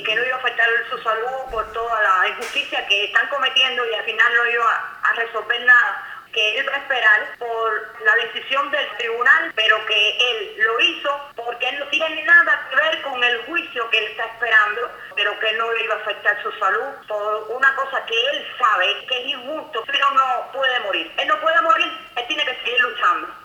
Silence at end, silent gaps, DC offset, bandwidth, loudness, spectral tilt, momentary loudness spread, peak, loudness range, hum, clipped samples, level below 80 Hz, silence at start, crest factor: 0 s; none; under 0.1%; 19 kHz; -18 LUFS; -0.5 dB/octave; 9 LU; -2 dBFS; 3 LU; none; under 0.1%; -60 dBFS; 0 s; 18 dB